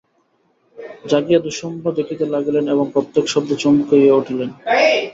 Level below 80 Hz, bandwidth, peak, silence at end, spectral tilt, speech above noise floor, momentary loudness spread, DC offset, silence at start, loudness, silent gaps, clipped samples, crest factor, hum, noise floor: -60 dBFS; 7.8 kHz; -2 dBFS; 0 s; -5 dB/octave; 46 dB; 11 LU; under 0.1%; 0.8 s; -17 LUFS; none; under 0.1%; 16 dB; none; -62 dBFS